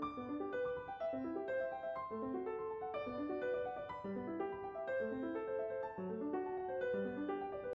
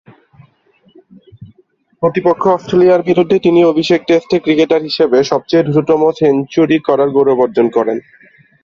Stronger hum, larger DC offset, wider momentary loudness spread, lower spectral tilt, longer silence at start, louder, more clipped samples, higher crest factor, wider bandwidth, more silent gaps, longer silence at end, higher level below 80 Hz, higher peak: neither; neither; about the same, 4 LU vs 4 LU; about the same, -5.5 dB/octave vs -6.5 dB/octave; second, 0 s vs 1.4 s; second, -42 LUFS vs -12 LUFS; neither; about the same, 12 dB vs 12 dB; second, 5.8 kHz vs 7.2 kHz; neither; second, 0 s vs 0.65 s; second, -72 dBFS vs -52 dBFS; second, -30 dBFS vs 0 dBFS